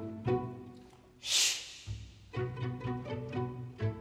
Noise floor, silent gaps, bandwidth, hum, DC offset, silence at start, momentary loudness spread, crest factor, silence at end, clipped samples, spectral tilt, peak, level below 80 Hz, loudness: -56 dBFS; none; 16.5 kHz; none; under 0.1%; 0 s; 19 LU; 22 dB; 0 s; under 0.1%; -3 dB/octave; -14 dBFS; -56 dBFS; -35 LUFS